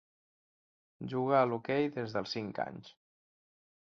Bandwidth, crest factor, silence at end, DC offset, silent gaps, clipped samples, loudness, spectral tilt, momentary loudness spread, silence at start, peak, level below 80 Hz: 7.4 kHz; 22 dB; 0.9 s; under 0.1%; none; under 0.1%; -33 LUFS; -4.5 dB/octave; 12 LU; 1 s; -14 dBFS; -74 dBFS